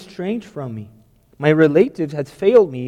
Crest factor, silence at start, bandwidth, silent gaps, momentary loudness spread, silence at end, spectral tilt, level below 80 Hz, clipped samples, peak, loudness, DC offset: 16 dB; 0 s; 10 kHz; none; 16 LU; 0 s; -8 dB/octave; -58 dBFS; under 0.1%; -2 dBFS; -17 LUFS; under 0.1%